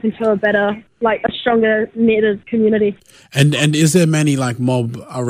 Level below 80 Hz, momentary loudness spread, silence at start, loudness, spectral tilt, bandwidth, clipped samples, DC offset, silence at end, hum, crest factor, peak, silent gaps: -52 dBFS; 7 LU; 0.05 s; -16 LUFS; -5.5 dB/octave; 15.5 kHz; under 0.1%; under 0.1%; 0 s; none; 14 dB; -2 dBFS; none